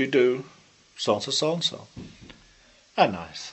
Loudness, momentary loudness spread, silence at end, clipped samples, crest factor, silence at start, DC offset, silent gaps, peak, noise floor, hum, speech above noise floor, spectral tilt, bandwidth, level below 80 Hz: -25 LUFS; 21 LU; 0 s; under 0.1%; 22 dB; 0 s; under 0.1%; none; -4 dBFS; -57 dBFS; none; 32 dB; -4 dB/octave; 8.4 kHz; -60 dBFS